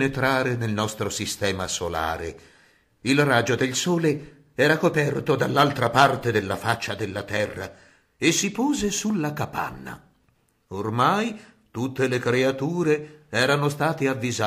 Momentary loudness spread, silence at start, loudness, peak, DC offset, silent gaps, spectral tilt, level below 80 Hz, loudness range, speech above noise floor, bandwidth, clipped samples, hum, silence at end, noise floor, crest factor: 12 LU; 0 s; -23 LUFS; -4 dBFS; under 0.1%; none; -4.5 dB/octave; -54 dBFS; 5 LU; 42 dB; 15.5 kHz; under 0.1%; none; 0 s; -65 dBFS; 20 dB